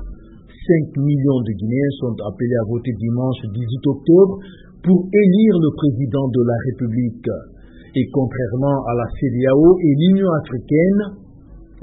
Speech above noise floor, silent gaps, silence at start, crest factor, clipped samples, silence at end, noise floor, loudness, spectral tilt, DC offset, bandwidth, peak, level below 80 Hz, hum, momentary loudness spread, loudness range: 25 dB; none; 0 s; 16 dB; under 0.1%; 0.05 s; -41 dBFS; -17 LUFS; -13.5 dB/octave; under 0.1%; 4 kHz; -2 dBFS; -42 dBFS; none; 12 LU; 4 LU